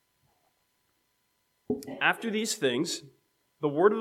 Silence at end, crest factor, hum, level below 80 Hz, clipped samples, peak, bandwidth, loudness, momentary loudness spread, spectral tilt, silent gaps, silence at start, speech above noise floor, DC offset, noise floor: 0 s; 24 dB; none; -76 dBFS; under 0.1%; -8 dBFS; 16 kHz; -29 LUFS; 11 LU; -3.5 dB/octave; none; 1.7 s; 47 dB; under 0.1%; -75 dBFS